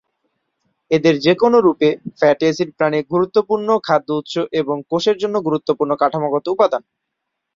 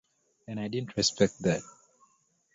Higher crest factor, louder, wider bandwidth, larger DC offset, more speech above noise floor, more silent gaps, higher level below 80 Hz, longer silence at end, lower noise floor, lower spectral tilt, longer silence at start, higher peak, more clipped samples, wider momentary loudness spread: second, 16 dB vs 24 dB; first, -17 LUFS vs -29 LUFS; about the same, 7.6 kHz vs 8 kHz; neither; first, 61 dB vs 40 dB; neither; about the same, -60 dBFS vs -60 dBFS; about the same, 0.75 s vs 0.85 s; first, -77 dBFS vs -69 dBFS; first, -6 dB/octave vs -4 dB/octave; first, 0.9 s vs 0.5 s; first, -2 dBFS vs -10 dBFS; neither; second, 7 LU vs 11 LU